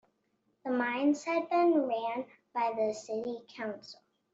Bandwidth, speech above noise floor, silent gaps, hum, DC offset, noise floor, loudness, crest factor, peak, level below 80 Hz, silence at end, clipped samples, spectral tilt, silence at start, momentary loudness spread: 8 kHz; 45 dB; none; none; under 0.1%; -76 dBFS; -32 LUFS; 16 dB; -18 dBFS; -82 dBFS; 0.4 s; under 0.1%; -4.5 dB/octave; 0.65 s; 13 LU